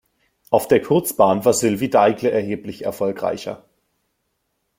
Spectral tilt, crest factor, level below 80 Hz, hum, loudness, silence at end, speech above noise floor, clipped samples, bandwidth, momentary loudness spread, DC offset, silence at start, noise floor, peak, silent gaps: -5 dB/octave; 18 dB; -58 dBFS; none; -19 LUFS; 1.2 s; 54 dB; under 0.1%; 16.5 kHz; 12 LU; under 0.1%; 0.5 s; -72 dBFS; -2 dBFS; none